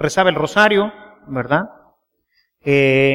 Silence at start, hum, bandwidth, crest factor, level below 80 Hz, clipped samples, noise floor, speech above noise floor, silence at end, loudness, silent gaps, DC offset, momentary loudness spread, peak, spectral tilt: 0 s; none; 13.5 kHz; 18 dB; -52 dBFS; under 0.1%; -65 dBFS; 50 dB; 0 s; -16 LUFS; none; under 0.1%; 14 LU; 0 dBFS; -5.5 dB/octave